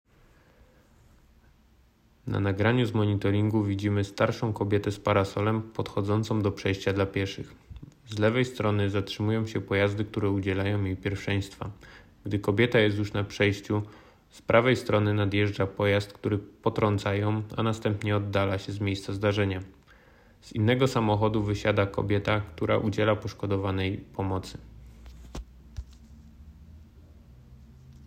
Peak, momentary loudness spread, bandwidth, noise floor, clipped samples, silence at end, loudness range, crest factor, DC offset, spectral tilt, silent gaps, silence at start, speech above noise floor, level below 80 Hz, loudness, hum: -8 dBFS; 14 LU; 9.8 kHz; -61 dBFS; under 0.1%; 0 s; 4 LU; 20 dB; under 0.1%; -7 dB/octave; none; 2.25 s; 34 dB; -52 dBFS; -27 LUFS; none